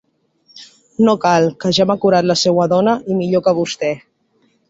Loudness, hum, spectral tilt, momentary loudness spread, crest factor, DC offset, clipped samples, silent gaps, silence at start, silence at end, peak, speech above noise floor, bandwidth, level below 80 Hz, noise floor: -15 LUFS; none; -5 dB/octave; 7 LU; 14 dB; under 0.1%; under 0.1%; none; 0.55 s; 0.75 s; -2 dBFS; 46 dB; 8 kHz; -56 dBFS; -60 dBFS